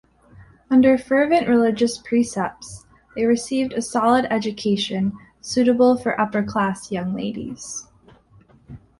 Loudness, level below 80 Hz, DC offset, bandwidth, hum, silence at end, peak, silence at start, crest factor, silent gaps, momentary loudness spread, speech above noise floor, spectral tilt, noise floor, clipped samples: -20 LUFS; -54 dBFS; under 0.1%; 11.5 kHz; none; 0.25 s; -4 dBFS; 0.4 s; 16 dB; none; 15 LU; 33 dB; -5 dB/octave; -53 dBFS; under 0.1%